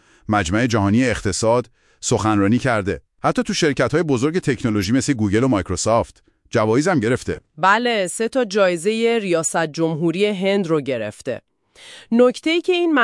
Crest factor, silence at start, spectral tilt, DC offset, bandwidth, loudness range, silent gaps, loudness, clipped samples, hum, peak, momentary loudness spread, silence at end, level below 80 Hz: 16 dB; 0.3 s; -5 dB/octave; under 0.1%; 12 kHz; 2 LU; none; -19 LUFS; under 0.1%; none; -2 dBFS; 6 LU; 0 s; -48 dBFS